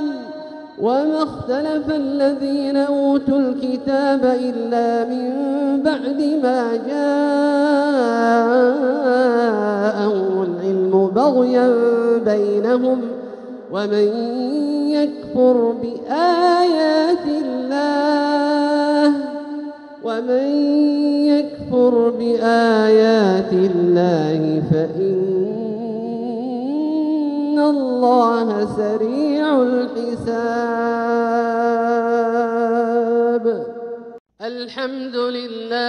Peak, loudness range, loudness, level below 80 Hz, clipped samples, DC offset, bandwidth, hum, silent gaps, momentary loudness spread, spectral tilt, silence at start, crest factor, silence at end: -4 dBFS; 4 LU; -18 LUFS; -60 dBFS; under 0.1%; under 0.1%; 9.8 kHz; none; 34.20-34.25 s; 10 LU; -7 dB/octave; 0 s; 14 dB; 0 s